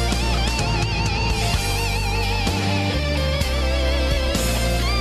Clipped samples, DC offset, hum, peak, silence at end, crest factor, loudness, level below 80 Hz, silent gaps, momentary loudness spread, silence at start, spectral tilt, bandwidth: under 0.1%; under 0.1%; none; -8 dBFS; 0 s; 12 dB; -21 LUFS; -24 dBFS; none; 1 LU; 0 s; -4.5 dB/octave; 13.5 kHz